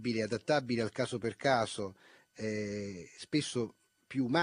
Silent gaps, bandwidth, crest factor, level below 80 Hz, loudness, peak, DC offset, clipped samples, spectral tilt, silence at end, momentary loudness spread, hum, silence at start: none; 10.5 kHz; 20 dB; -70 dBFS; -35 LUFS; -14 dBFS; under 0.1%; under 0.1%; -5 dB/octave; 0 s; 11 LU; none; 0 s